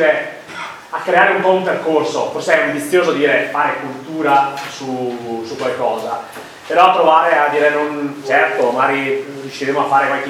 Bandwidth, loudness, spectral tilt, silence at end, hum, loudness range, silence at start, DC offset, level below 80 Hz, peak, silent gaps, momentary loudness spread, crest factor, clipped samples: 16 kHz; -15 LUFS; -4.5 dB/octave; 0 s; none; 4 LU; 0 s; under 0.1%; -66 dBFS; 0 dBFS; none; 14 LU; 16 dB; under 0.1%